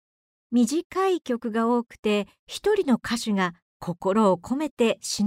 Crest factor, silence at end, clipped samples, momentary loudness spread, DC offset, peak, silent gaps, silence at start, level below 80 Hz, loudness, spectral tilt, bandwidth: 16 dB; 0 s; under 0.1%; 7 LU; under 0.1%; -10 dBFS; 0.84-0.90 s, 1.99-2.03 s, 2.39-2.47 s, 3.62-3.80 s, 4.71-4.77 s; 0.5 s; -60 dBFS; -25 LUFS; -5 dB/octave; 16 kHz